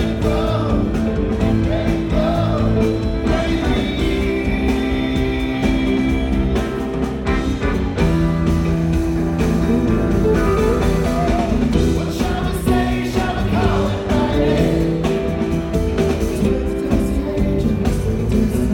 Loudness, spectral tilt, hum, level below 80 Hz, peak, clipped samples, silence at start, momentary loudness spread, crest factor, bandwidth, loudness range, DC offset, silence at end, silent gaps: -18 LUFS; -7 dB/octave; none; -24 dBFS; -4 dBFS; under 0.1%; 0 s; 3 LU; 14 dB; 17 kHz; 2 LU; under 0.1%; 0 s; none